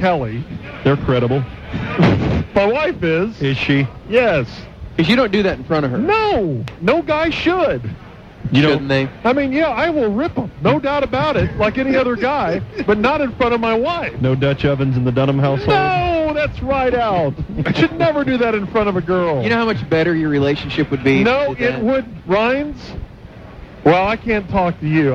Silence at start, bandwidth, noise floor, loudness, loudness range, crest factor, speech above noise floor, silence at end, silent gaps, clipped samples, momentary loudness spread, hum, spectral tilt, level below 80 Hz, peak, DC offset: 0 s; 7.8 kHz; -36 dBFS; -17 LUFS; 1 LU; 16 dB; 20 dB; 0 s; none; under 0.1%; 7 LU; none; -7.5 dB/octave; -36 dBFS; 0 dBFS; under 0.1%